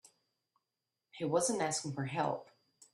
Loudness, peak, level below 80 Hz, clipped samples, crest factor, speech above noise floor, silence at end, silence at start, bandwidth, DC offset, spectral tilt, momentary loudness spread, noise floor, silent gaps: -35 LUFS; -18 dBFS; -80 dBFS; under 0.1%; 22 dB; 54 dB; 0.5 s; 1.15 s; 12.5 kHz; under 0.1%; -4 dB/octave; 8 LU; -89 dBFS; none